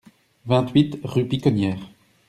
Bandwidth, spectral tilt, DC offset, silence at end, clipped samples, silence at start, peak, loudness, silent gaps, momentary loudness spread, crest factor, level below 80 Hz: 12.5 kHz; -8 dB/octave; under 0.1%; 0.4 s; under 0.1%; 0.45 s; -4 dBFS; -21 LUFS; none; 10 LU; 18 dB; -54 dBFS